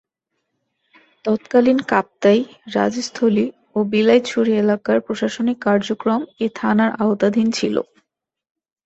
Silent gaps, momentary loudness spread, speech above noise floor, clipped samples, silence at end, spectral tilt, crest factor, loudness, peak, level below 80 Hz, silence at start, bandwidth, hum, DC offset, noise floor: none; 8 LU; 63 dB; under 0.1%; 1 s; -5.5 dB/octave; 18 dB; -18 LUFS; -2 dBFS; -60 dBFS; 1.25 s; 8.2 kHz; none; under 0.1%; -81 dBFS